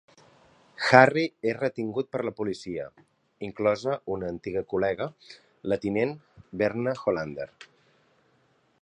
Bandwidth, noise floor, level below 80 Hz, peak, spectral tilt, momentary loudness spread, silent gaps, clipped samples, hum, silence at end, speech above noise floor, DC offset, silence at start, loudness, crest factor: 10.5 kHz; -66 dBFS; -62 dBFS; 0 dBFS; -6 dB/octave; 19 LU; none; under 0.1%; none; 1.2 s; 40 dB; under 0.1%; 0.8 s; -27 LUFS; 28 dB